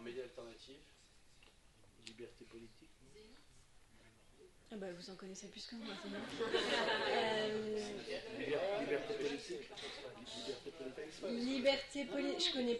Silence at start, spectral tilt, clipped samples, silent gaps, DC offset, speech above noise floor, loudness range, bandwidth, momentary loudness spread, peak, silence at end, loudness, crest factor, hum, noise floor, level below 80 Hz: 0 s; -3.5 dB/octave; under 0.1%; none; under 0.1%; 24 dB; 21 LU; 11.5 kHz; 22 LU; -22 dBFS; 0 s; -41 LUFS; 22 dB; none; -66 dBFS; -70 dBFS